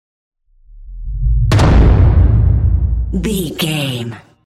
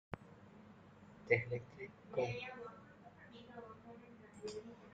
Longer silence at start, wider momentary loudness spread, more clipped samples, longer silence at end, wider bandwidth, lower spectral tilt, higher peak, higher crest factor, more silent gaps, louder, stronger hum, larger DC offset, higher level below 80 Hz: first, 0.75 s vs 0.1 s; second, 13 LU vs 24 LU; neither; first, 0.25 s vs 0 s; first, 14 kHz vs 8.8 kHz; about the same, -6.5 dB/octave vs -6 dB/octave; first, -2 dBFS vs -18 dBFS; second, 12 dB vs 28 dB; neither; first, -14 LUFS vs -43 LUFS; neither; neither; first, -16 dBFS vs -74 dBFS